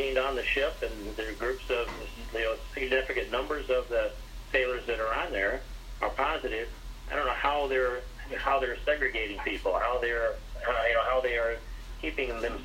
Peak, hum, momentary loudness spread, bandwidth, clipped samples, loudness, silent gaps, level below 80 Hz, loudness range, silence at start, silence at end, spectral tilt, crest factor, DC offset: -12 dBFS; none; 9 LU; 16 kHz; under 0.1%; -30 LUFS; none; -42 dBFS; 2 LU; 0 s; 0 s; -4.5 dB/octave; 18 dB; under 0.1%